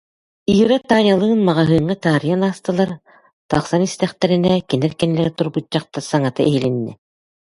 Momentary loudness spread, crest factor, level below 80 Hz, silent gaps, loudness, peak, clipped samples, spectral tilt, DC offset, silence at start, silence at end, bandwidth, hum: 8 LU; 18 dB; -48 dBFS; 3.33-3.49 s; -17 LUFS; 0 dBFS; under 0.1%; -6.5 dB/octave; under 0.1%; 0.5 s; 0.6 s; 11.5 kHz; none